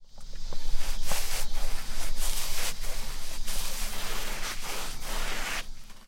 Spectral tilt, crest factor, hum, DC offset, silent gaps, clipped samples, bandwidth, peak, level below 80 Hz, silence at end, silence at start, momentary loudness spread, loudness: -1.5 dB/octave; 12 dB; none; under 0.1%; none; under 0.1%; 16.5 kHz; -10 dBFS; -32 dBFS; 0.1 s; 0 s; 7 LU; -35 LUFS